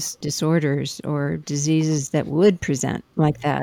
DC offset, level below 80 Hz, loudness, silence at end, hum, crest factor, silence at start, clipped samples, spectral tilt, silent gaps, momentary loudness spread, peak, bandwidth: under 0.1%; -52 dBFS; -22 LUFS; 0 s; none; 16 dB; 0 s; under 0.1%; -5.5 dB/octave; none; 7 LU; -6 dBFS; 17 kHz